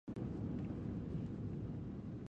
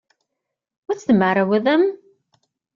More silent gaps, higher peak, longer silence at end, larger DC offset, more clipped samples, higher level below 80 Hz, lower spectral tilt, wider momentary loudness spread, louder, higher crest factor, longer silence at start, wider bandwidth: neither; second, -30 dBFS vs -6 dBFS; second, 0 s vs 0.8 s; neither; neither; first, -56 dBFS vs -62 dBFS; first, -10 dB/octave vs -7 dB/octave; second, 3 LU vs 11 LU; second, -44 LUFS vs -18 LUFS; about the same, 12 dB vs 16 dB; second, 0.05 s vs 0.9 s; about the same, 8 kHz vs 7.4 kHz